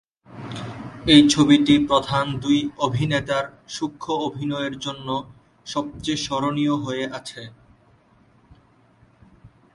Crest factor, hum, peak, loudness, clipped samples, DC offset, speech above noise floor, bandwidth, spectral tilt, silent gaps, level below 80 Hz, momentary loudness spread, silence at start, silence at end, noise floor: 22 dB; none; 0 dBFS; -21 LUFS; under 0.1%; under 0.1%; 36 dB; 11.5 kHz; -5 dB/octave; none; -50 dBFS; 19 LU; 0.3 s; 0.25 s; -56 dBFS